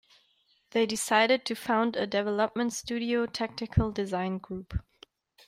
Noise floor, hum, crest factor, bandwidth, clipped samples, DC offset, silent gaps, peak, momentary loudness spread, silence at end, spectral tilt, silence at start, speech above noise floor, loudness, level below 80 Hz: -69 dBFS; none; 20 dB; 16 kHz; under 0.1%; under 0.1%; none; -10 dBFS; 11 LU; 0.65 s; -4.5 dB/octave; 0.75 s; 40 dB; -29 LUFS; -48 dBFS